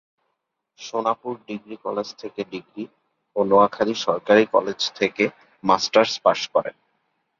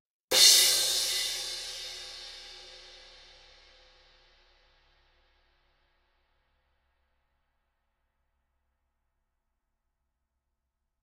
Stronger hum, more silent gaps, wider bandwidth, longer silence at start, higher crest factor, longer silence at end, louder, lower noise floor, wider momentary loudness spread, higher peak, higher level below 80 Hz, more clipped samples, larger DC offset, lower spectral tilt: neither; neither; second, 7.4 kHz vs 16 kHz; first, 0.8 s vs 0.3 s; second, 20 dB vs 28 dB; second, 0.7 s vs 8.25 s; about the same, -22 LUFS vs -22 LUFS; second, -77 dBFS vs -83 dBFS; second, 16 LU vs 27 LU; first, -2 dBFS vs -6 dBFS; about the same, -66 dBFS vs -66 dBFS; neither; neither; first, -4 dB/octave vs 2.5 dB/octave